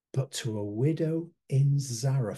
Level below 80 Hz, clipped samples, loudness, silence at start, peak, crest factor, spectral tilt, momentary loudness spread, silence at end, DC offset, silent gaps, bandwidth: -70 dBFS; under 0.1%; -29 LUFS; 0.15 s; -16 dBFS; 12 dB; -6.5 dB/octave; 7 LU; 0 s; under 0.1%; none; 12.5 kHz